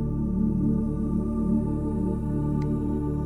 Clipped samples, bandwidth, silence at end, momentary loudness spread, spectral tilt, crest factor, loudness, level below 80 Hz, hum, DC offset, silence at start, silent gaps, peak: under 0.1%; 9.8 kHz; 0 s; 3 LU; -11 dB/octave; 12 dB; -27 LUFS; -34 dBFS; none; under 0.1%; 0 s; none; -14 dBFS